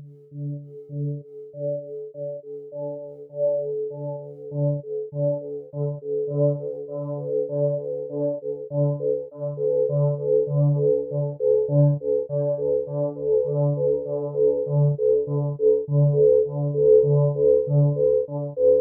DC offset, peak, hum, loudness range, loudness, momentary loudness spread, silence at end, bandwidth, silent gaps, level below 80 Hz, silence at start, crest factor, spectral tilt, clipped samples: under 0.1%; -6 dBFS; none; 10 LU; -23 LUFS; 14 LU; 0 s; 1.4 kHz; none; -58 dBFS; 0 s; 16 dB; -16 dB/octave; under 0.1%